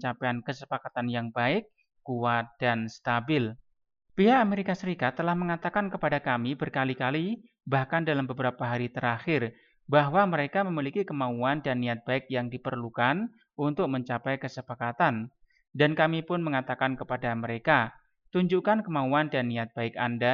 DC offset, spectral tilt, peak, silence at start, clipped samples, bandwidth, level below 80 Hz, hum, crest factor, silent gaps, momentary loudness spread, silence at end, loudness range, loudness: under 0.1%; -7.5 dB/octave; -8 dBFS; 0 s; under 0.1%; 7.2 kHz; -64 dBFS; none; 20 dB; none; 9 LU; 0 s; 2 LU; -28 LUFS